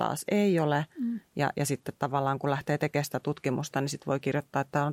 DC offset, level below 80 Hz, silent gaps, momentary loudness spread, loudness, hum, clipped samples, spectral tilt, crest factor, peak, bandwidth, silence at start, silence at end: under 0.1%; -68 dBFS; none; 6 LU; -30 LUFS; none; under 0.1%; -6 dB/octave; 16 dB; -12 dBFS; 16.5 kHz; 0 s; 0 s